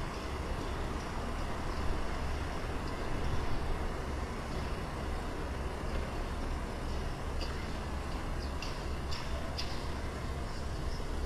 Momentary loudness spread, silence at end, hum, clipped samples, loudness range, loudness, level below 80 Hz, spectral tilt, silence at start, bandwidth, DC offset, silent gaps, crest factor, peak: 2 LU; 0 s; none; under 0.1%; 1 LU; -39 LUFS; -38 dBFS; -5.5 dB/octave; 0 s; 14 kHz; under 0.1%; none; 16 dB; -20 dBFS